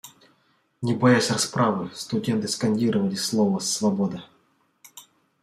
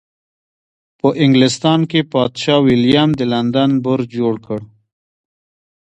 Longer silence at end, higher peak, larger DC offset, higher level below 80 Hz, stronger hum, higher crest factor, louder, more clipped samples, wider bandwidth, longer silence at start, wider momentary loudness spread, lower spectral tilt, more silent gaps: second, 0.4 s vs 1.25 s; second, -6 dBFS vs 0 dBFS; neither; second, -66 dBFS vs -52 dBFS; neither; about the same, 20 dB vs 16 dB; second, -23 LUFS vs -14 LUFS; neither; first, 15 kHz vs 9.2 kHz; second, 0.05 s vs 1.05 s; first, 10 LU vs 7 LU; second, -4.5 dB/octave vs -6 dB/octave; neither